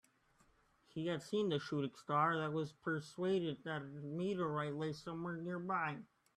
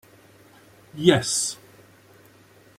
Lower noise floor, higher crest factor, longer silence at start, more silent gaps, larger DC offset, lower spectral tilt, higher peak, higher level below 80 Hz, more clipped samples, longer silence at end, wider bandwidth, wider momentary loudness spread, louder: first, -73 dBFS vs -54 dBFS; second, 18 dB vs 26 dB; about the same, 0.95 s vs 0.95 s; neither; neither; first, -6.5 dB/octave vs -3.5 dB/octave; second, -22 dBFS vs -2 dBFS; second, -78 dBFS vs -60 dBFS; neither; second, 0.3 s vs 1.25 s; second, 12 kHz vs 16 kHz; second, 9 LU vs 22 LU; second, -40 LUFS vs -21 LUFS